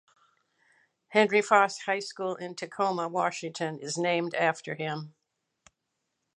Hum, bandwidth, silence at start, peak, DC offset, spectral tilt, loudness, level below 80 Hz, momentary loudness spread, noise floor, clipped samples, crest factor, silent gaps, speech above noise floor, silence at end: none; 11 kHz; 1.1 s; -6 dBFS; under 0.1%; -4 dB/octave; -28 LUFS; -84 dBFS; 11 LU; -82 dBFS; under 0.1%; 24 dB; none; 54 dB; 1.25 s